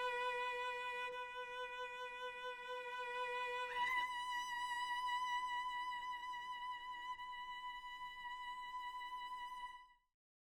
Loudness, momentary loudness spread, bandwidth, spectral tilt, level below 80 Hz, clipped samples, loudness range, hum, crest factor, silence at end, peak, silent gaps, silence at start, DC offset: -44 LUFS; 8 LU; 17.5 kHz; 0 dB/octave; -74 dBFS; under 0.1%; 7 LU; none; 16 dB; 0.5 s; -28 dBFS; none; 0 s; under 0.1%